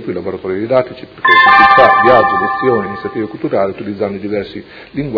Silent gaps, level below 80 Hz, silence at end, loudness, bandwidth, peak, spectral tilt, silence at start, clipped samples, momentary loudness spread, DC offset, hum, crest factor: none; -46 dBFS; 0 s; -11 LUFS; 5.4 kHz; 0 dBFS; -7 dB/octave; 0 s; 0.5%; 16 LU; under 0.1%; none; 12 dB